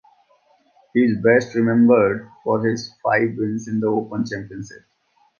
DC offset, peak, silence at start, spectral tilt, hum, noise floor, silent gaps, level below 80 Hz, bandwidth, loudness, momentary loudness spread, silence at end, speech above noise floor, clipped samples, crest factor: under 0.1%; -2 dBFS; 0.95 s; -7 dB/octave; none; -59 dBFS; none; -58 dBFS; 7 kHz; -19 LUFS; 12 LU; 0.7 s; 40 dB; under 0.1%; 18 dB